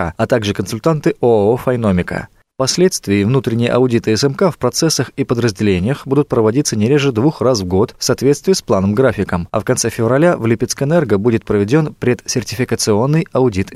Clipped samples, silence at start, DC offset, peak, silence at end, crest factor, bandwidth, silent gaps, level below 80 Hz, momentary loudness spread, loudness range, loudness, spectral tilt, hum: under 0.1%; 0 s; under 0.1%; -2 dBFS; 0 s; 14 dB; 15 kHz; none; -44 dBFS; 5 LU; 1 LU; -15 LUFS; -5.5 dB/octave; none